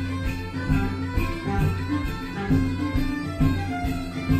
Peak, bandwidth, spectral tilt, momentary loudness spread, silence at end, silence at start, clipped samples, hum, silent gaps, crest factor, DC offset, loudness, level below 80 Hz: -8 dBFS; 15 kHz; -7 dB/octave; 6 LU; 0 s; 0 s; under 0.1%; none; none; 18 dB; 0.1%; -26 LUFS; -32 dBFS